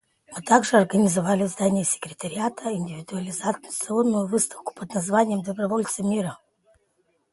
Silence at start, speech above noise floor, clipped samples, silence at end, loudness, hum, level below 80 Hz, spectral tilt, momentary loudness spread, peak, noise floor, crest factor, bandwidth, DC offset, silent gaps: 0.3 s; 45 dB; under 0.1%; 0.95 s; -24 LUFS; none; -66 dBFS; -5 dB/octave; 12 LU; -2 dBFS; -69 dBFS; 22 dB; 12 kHz; under 0.1%; none